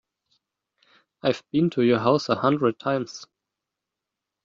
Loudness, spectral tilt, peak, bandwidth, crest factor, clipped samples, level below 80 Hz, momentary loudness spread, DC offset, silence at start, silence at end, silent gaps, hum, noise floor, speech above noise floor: -23 LUFS; -6.5 dB/octave; -6 dBFS; 7.6 kHz; 20 dB; under 0.1%; -66 dBFS; 8 LU; under 0.1%; 1.25 s; 1.2 s; none; none; -86 dBFS; 63 dB